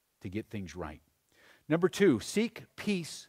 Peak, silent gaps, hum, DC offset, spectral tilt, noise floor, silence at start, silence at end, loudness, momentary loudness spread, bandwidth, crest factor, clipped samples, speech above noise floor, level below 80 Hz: -14 dBFS; none; none; under 0.1%; -5.5 dB/octave; -64 dBFS; 0.25 s; 0.05 s; -32 LUFS; 16 LU; 16 kHz; 20 dB; under 0.1%; 32 dB; -62 dBFS